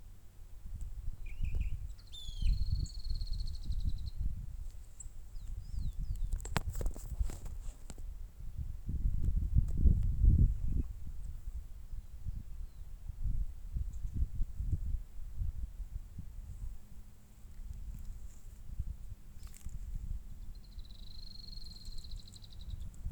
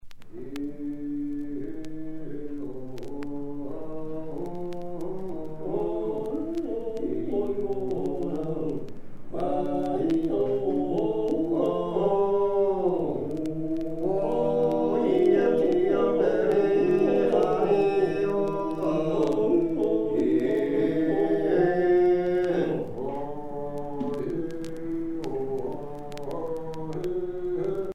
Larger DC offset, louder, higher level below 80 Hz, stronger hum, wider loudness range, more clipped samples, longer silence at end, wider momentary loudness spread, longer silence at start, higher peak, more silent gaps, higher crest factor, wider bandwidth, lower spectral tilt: neither; second, -41 LUFS vs -27 LUFS; first, -38 dBFS vs -50 dBFS; neither; first, 15 LU vs 12 LU; neither; about the same, 0 s vs 0 s; first, 18 LU vs 13 LU; about the same, 0 s vs 0.05 s; about the same, -10 dBFS vs -10 dBFS; neither; first, 26 dB vs 16 dB; first, 20 kHz vs 9.4 kHz; second, -6 dB/octave vs -8 dB/octave